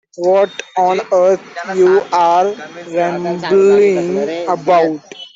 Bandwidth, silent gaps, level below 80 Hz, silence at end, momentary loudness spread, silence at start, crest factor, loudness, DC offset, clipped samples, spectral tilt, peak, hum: 7.6 kHz; none; -62 dBFS; 0.1 s; 8 LU; 0.2 s; 12 dB; -14 LUFS; under 0.1%; under 0.1%; -5.5 dB/octave; -2 dBFS; none